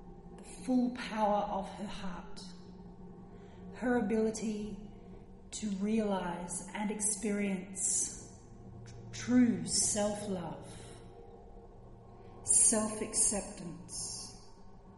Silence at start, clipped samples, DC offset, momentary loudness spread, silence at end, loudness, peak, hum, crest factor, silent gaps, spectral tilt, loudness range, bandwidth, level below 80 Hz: 0 s; under 0.1%; under 0.1%; 24 LU; 0 s; -32 LUFS; -12 dBFS; none; 24 dB; none; -3.5 dB/octave; 7 LU; 11.5 kHz; -56 dBFS